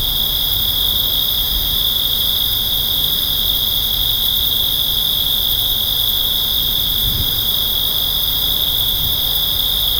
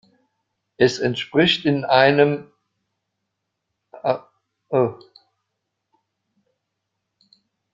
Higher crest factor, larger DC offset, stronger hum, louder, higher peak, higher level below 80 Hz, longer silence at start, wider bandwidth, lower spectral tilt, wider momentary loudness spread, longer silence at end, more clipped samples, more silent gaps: second, 14 dB vs 22 dB; neither; neither; first, -14 LUFS vs -19 LUFS; about the same, -2 dBFS vs -2 dBFS; first, -30 dBFS vs -62 dBFS; second, 0 s vs 0.8 s; first, over 20 kHz vs 7.8 kHz; second, -1.5 dB/octave vs -5.5 dB/octave; second, 1 LU vs 10 LU; second, 0 s vs 2.8 s; neither; neither